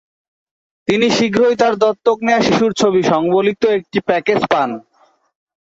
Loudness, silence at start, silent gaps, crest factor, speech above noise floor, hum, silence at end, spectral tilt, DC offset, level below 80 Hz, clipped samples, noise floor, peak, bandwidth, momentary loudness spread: -15 LUFS; 0.9 s; none; 14 dB; 42 dB; none; 1 s; -5 dB/octave; under 0.1%; -54 dBFS; under 0.1%; -56 dBFS; -2 dBFS; 8 kHz; 5 LU